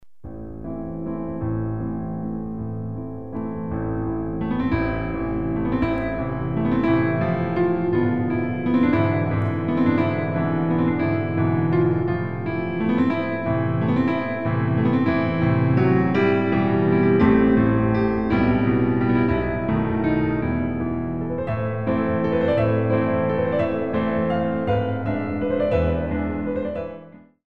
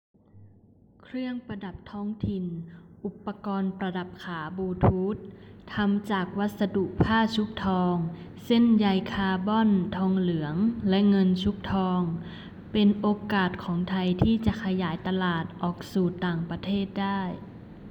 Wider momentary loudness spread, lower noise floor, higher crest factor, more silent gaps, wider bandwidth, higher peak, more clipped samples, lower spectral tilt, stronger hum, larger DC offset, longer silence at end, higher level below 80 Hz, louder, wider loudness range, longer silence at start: second, 10 LU vs 14 LU; second, -43 dBFS vs -57 dBFS; about the same, 16 dB vs 18 dB; neither; second, 5.4 kHz vs 8 kHz; first, -4 dBFS vs -10 dBFS; neither; first, -10.5 dB/octave vs -8 dB/octave; neither; first, 0.9% vs under 0.1%; about the same, 0.05 s vs 0 s; first, -40 dBFS vs -50 dBFS; first, -22 LUFS vs -27 LUFS; about the same, 8 LU vs 9 LU; second, 0 s vs 0.35 s